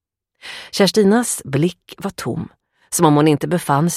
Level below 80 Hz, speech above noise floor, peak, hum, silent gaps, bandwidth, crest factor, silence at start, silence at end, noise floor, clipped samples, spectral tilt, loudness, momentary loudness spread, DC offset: -56 dBFS; 25 dB; 0 dBFS; none; none; 16 kHz; 18 dB; 0.45 s; 0 s; -41 dBFS; under 0.1%; -5 dB/octave; -17 LUFS; 19 LU; under 0.1%